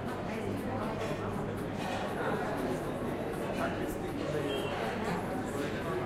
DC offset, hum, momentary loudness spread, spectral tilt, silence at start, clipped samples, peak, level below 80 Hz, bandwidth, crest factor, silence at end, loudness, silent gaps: under 0.1%; none; 3 LU; -6 dB/octave; 0 s; under 0.1%; -22 dBFS; -52 dBFS; 16 kHz; 14 dB; 0 s; -35 LUFS; none